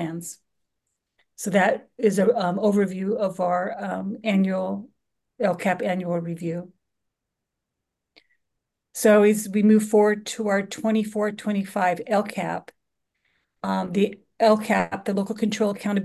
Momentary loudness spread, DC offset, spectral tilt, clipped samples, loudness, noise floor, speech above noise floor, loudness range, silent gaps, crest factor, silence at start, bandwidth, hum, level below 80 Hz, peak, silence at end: 12 LU; under 0.1%; -6 dB/octave; under 0.1%; -23 LUFS; -83 dBFS; 61 dB; 8 LU; none; 18 dB; 0 s; 12.5 kHz; none; -68 dBFS; -6 dBFS; 0 s